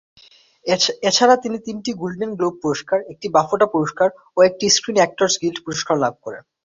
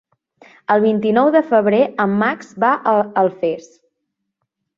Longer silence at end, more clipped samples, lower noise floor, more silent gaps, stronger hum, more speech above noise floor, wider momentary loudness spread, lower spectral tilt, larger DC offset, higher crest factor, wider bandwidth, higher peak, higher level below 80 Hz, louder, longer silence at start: second, 0.25 s vs 1.2 s; neither; second, -47 dBFS vs -76 dBFS; neither; neither; second, 28 dB vs 60 dB; first, 11 LU vs 8 LU; second, -3 dB/octave vs -7.5 dB/octave; neither; about the same, 18 dB vs 16 dB; about the same, 7.8 kHz vs 7.4 kHz; about the same, -2 dBFS vs -2 dBFS; about the same, -62 dBFS vs -64 dBFS; second, -19 LUFS vs -16 LUFS; about the same, 0.65 s vs 0.7 s